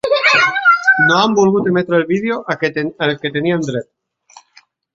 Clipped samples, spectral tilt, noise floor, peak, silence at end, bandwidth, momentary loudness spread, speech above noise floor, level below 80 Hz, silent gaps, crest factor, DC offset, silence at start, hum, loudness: under 0.1%; -5 dB/octave; -51 dBFS; 0 dBFS; 1.15 s; 8.2 kHz; 9 LU; 36 dB; -58 dBFS; none; 14 dB; under 0.1%; 0.05 s; none; -14 LUFS